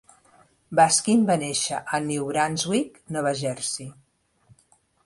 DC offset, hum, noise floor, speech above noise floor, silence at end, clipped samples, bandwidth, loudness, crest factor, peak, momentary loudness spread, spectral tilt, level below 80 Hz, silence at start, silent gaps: under 0.1%; none; -63 dBFS; 39 dB; 1.15 s; under 0.1%; 11.5 kHz; -23 LUFS; 20 dB; -6 dBFS; 11 LU; -3.5 dB/octave; -64 dBFS; 0.7 s; none